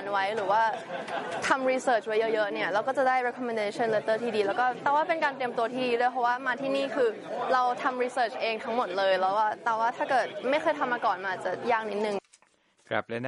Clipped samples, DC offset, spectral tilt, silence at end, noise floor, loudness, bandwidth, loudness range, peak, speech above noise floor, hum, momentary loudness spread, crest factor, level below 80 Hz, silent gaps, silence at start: under 0.1%; under 0.1%; -4 dB/octave; 0 s; -66 dBFS; -28 LUFS; 11.5 kHz; 1 LU; -10 dBFS; 38 dB; none; 6 LU; 18 dB; -78 dBFS; none; 0 s